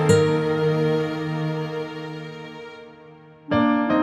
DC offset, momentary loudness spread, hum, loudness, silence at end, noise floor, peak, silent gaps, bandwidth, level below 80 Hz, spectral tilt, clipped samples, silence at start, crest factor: under 0.1%; 18 LU; none; -23 LUFS; 0 s; -46 dBFS; -4 dBFS; none; 12.5 kHz; -58 dBFS; -6.5 dB/octave; under 0.1%; 0 s; 18 dB